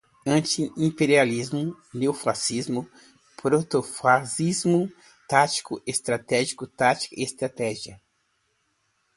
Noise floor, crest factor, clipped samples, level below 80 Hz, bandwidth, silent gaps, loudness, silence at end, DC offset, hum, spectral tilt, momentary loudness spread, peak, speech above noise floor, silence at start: -71 dBFS; 22 dB; under 0.1%; -64 dBFS; 11.5 kHz; none; -24 LUFS; 1.2 s; under 0.1%; none; -4.5 dB/octave; 9 LU; -2 dBFS; 47 dB; 0.25 s